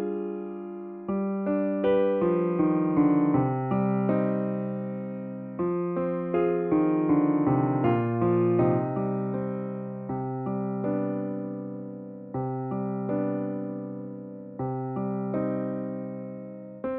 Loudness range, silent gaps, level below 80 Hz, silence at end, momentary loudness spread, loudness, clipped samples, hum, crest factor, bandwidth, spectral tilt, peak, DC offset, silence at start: 8 LU; none; -62 dBFS; 0 s; 13 LU; -28 LUFS; under 0.1%; none; 16 dB; 3.7 kHz; -9.5 dB/octave; -12 dBFS; under 0.1%; 0 s